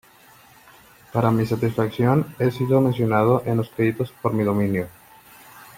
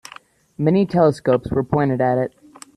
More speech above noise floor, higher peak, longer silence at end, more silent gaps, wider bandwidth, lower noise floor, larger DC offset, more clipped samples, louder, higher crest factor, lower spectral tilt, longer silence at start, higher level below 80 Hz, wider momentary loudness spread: about the same, 30 dB vs 27 dB; about the same, -4 dBFS vs -2 dBFS; second, 0.15 s vs 0.5 s; neither; first, 16.5 kHz vs 12.5 kHz; first, -51 dBFS vs -45 dBFS; neither; neither; about the same, -21 LUFS vs -19 LUFS; about the same, 18 dB vs 16 dB; about the same, -8.5 dB/octave vs -8 dB/octave; first, 1.15 s vs 0.6 s; second, -54 dBFS vs -48 dBFS; about the same, 6 LU vs 6 LU